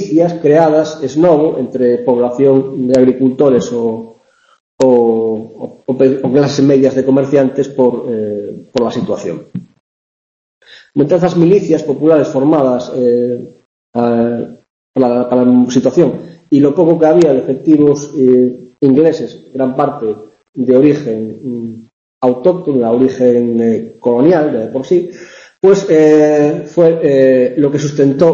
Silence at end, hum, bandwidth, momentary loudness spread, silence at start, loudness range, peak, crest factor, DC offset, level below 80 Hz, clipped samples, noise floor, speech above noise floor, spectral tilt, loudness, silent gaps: 0 s; none; 7.8 kHz; 12 LU; 0 s; 5 LU; 0 dBFS; 12 dB; under 0.1%; -54 dBFS; under 0.1%; -47 dBFS; 36 dB; -7.5 dB/octave; -12 LUFS; 4.60-4.78 s, 9.80-10.61 s, 13.65-13.93 s, 14.70-14.94 s, 20.49-20.53 s, 21.93-22.21 s